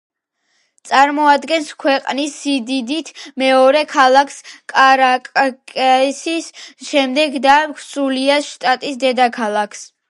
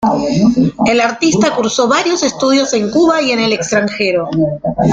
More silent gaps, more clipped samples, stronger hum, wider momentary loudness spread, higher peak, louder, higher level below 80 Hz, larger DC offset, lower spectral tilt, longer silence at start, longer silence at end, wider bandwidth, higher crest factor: neither; neither; neither; first, 11 LU vs 4 LU; about the same, 0 dBFS vs 0 dBFS; about the same, -15 LUFS vs -13 LUFS; second, -66 dBFS vs -44 dBFS; neither; second, -2 dB/octave vs -4.5 dB/octave; first, 0.85 s vs 0 s; first, 0.25 s vs 0 s; first, 11.5 kHz vs 9.4 kHz; about the same, 16 dB vs 12 dB